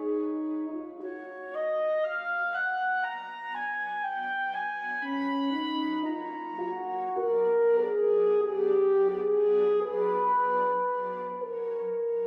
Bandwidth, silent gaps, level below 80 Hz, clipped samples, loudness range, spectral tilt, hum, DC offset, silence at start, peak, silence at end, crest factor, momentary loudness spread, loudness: 5.2 kHz; none; -78 dBFS; under 0.1%; 6 LU; -6.5 dB/octave; none; under 0.1%; 0 s; -16 dBFS; 0 s; 12 dB; 10 LU; -28 LUFS